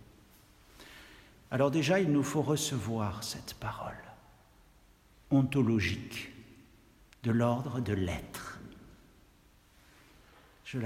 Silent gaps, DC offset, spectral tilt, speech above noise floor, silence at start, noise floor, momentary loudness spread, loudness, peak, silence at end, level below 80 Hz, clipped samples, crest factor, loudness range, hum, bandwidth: none; under 0.1%; -5.5 dB/octave; 32 dB; 0.8 s; -62 dBFS; 24 LU; -32 LUFS; -16 dBFS; 0 s; -60 dBFS; under 0.1%; 20 dB; 4 LU; none; 16 kHz